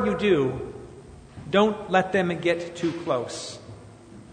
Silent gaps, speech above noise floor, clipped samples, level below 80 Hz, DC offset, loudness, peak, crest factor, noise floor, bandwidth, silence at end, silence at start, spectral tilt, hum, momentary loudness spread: none; 22 dB; under 0.1%; -54 dBFS; under 0.1%; -25 LUFS; -6 dBFS; 20 dB; -46 dBFS; 9.6 kHz; 0 s; 0 s; -5.5 dB/octave; none; 23 LU